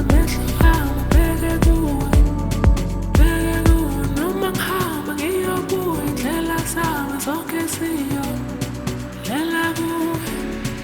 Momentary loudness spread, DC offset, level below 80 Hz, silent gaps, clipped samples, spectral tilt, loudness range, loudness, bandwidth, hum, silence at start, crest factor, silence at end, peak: 8 LU; under 0.1%; -22 dBFS; none; under 0.1%; -5.5 dB/octave; 5 LU; -20 LUFS; over 20 kHz; none; 0 s; 16 dB; 0 s; -2 dBFS